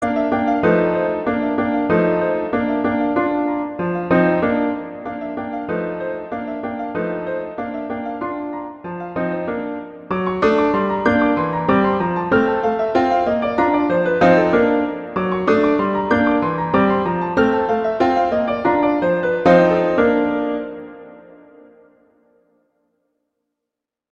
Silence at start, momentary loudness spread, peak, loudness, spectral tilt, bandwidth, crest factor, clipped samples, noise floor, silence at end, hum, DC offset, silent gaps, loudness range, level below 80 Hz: 0 s; 11 LU; -2 dBFS; -18 LUFS; -8 dB/octave; 7.2 kHz; 18 dB; under 0.1%; -83 dBFS; 2.9 s; none; under 0.1%; none; 9 LU; -48 dBFS